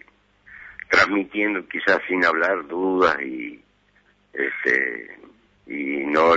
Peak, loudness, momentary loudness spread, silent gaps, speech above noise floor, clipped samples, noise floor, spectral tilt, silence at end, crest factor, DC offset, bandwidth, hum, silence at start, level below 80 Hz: -6 dBFS; -21 LUFS; 17 LU; none; 39 dB; under 0.1%; -61 dBFS; -4.5 dB/octave; 0 s; 18 dB; under 0.1%; 8 kHz; 50 Hz at -60 dBFS; 0.5 s; -58 dBFS